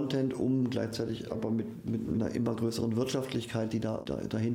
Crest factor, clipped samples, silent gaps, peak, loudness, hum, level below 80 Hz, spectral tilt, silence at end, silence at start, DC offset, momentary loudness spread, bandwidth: 12 dB; under 0.1%; none; -18 dBFS; -33 LUFS; none; -60 dBFS; -6.5 dB/octave; 0 s; 0 s; under 0.1%; 5 LU; 16 kHz